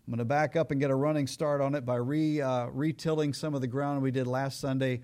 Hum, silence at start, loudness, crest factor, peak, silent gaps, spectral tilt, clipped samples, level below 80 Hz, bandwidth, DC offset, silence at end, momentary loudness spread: none; 0.05 s; -30 LUFS; 12 dB; -16 dBFS; none; -7 dB/octave; under 0.1%; -64 dBFS; 15.5 kHz; under 0.1%; 0 s; 4 LU